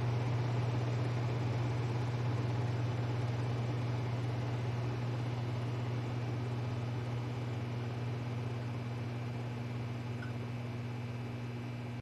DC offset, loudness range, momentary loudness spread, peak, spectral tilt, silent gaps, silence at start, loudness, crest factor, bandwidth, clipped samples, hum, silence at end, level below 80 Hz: under 0.1%; 5 LU; 6 LU; -24 dBFS; -7.5 dB/octave; none; 0 s; -37 LUFS; 12 dB; 8 kHz; under 0.1%; none; 0 s; -60 dBFS